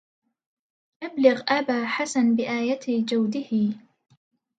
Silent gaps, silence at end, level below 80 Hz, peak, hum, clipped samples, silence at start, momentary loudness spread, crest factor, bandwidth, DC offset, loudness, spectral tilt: none; 0.8 s; -76 dBFS; -4 dBFS; none; under 0.1%; 1 s; 7 LU; 20 dB; 9.4 kHz; under 0.1%; -24 LUFS; -5 dB/octave